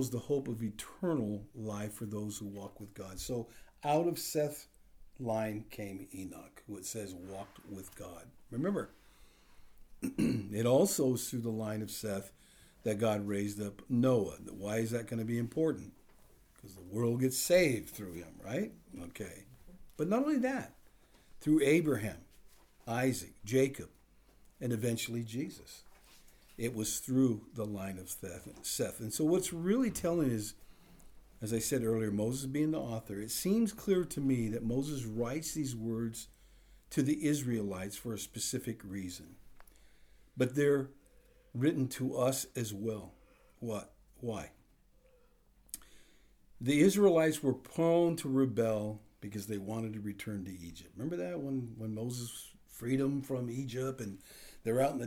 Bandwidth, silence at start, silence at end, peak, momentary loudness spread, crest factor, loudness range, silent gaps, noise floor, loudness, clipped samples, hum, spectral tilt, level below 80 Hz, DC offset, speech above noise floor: over 20 kHz; 0 s; 0 s; -16 dBFS; 17 LU; 20 dB; 8 LU; none; -66 dBFS; -35 LUFS; under 0.1%; none; -5.5 dB/octave; -62 dBFS; under 0.1%; 32 dB